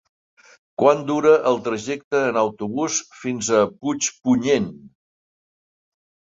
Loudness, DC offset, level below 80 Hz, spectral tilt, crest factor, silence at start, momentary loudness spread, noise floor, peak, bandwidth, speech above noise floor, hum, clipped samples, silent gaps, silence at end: -20 LUFS; under 0.1%; -62 dBFS; -4 dB/octave; 20 dB; 0.8 s; 9 LU; under -90 dBFS; -2 dBFS; 8 kHz; over 70 dB; none; under 0.1%; 2.04-2.11 s; 1.45 s